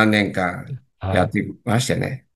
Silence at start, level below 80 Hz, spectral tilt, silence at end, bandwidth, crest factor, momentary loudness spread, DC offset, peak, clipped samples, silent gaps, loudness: 0 s; -56 dBFS; -5.5 dB/octave; 0.15 s; 12.5 kHz; 20 dB; 12 LU; under 0.1%; 0 dBFS; under 0.1%; none; -21 LUFS